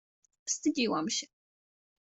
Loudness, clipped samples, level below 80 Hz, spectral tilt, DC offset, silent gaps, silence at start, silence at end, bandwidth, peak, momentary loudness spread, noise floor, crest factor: -32 LUFS; under 0.1%; -76 dBFS; -2.5 dB/octave; under 0.1%; none; 0.45 s; 0.9 s; 8.2 kHz; -18 dBFS; 13 LU; under -90 dBFS; 18 dB